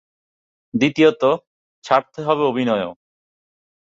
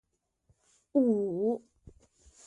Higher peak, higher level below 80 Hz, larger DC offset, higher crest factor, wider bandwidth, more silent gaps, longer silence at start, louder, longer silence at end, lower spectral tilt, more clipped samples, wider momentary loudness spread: first, -2 dBFS vs -16 dBFS; about the same, -62 dBFS vs -66 dBFS; neither; about the same, 18 dB vs 18 dB; second, 7.8 kHz vs 10.5 kHz; first, 1.47-1.82 s vs none; second, 0.75 s vs 0.95 s; first, -19 LUFS vs -30 LUFS; first, 1.05 s vs 0.55 s; second, -6 dB/octave vs -9.5 dB/octave; neither; first, 10 LU vs 6 LU